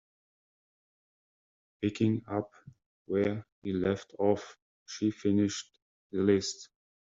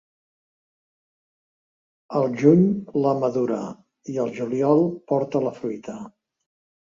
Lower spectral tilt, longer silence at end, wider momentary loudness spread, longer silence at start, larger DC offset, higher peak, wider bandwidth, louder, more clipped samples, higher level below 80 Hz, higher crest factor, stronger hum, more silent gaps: second, -6.5 dB/octave vs -9 dB/octave; second, 0.45 s vs 0.75 s; second, 15 LU vs 19 LU; second, 1.8 s vs 2.1 s; neither; second, -14 dBFS vs -2 dBFS; about the same, 7.8 kHz vs 7.4 kHz; second, -31 LUFS vs -22 LUFS; neither; about the same, -68 dBFS vs -66 dBFS; about the same, 20 dB vs 22 dB; neither; first, 2.86-3.05 s, 3.52-3.62 s, 4.62-4.86 s, 5.82-6.10 s vs none